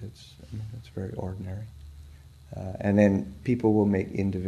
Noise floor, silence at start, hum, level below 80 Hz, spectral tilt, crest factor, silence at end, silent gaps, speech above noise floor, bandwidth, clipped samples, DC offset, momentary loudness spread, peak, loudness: -49 dBFS; 0 s; none; -50 dBFS; -9 dB/octave; 22 dB; 0 s; none; 22 dB; 10 kHz; under 0.1%; under 0.1%; 22 LU; -6 dBFS; -27 LUFS